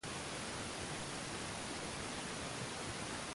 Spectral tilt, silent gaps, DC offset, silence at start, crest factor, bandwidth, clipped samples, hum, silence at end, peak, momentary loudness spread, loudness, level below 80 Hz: -3 dB/octave; none; under 0.1%; 0.05 s; 14 dB; 11.5 kHz; under 0.1%; none; 0 s; -30 dBFS; 0 LU; -43 LUFS; -60 dBFS